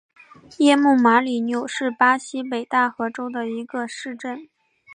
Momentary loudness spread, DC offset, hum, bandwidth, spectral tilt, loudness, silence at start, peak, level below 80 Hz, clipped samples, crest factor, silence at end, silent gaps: 15 LU; under 0.1%; none; 10.5 kHz; -3.5 dB/octave; -20 LUFS; 0.6 s; -4 dBFS; -74 dBFS; under 0.1%; 18 dB; 0 s; none